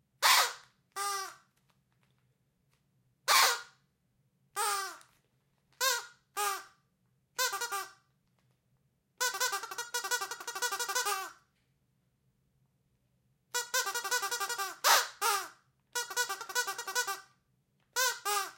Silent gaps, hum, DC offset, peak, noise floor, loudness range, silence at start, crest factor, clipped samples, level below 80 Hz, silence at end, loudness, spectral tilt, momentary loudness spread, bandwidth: none; none; under 0.1%; -10 dBFS; -76 dBFS; 6 LU; 0.2 s; 26 dB; under 0.1%; -88 dBFS; 0.05 s; -31 LUFS; 2.5 dB/octave; 15 LU; 16.5 kHz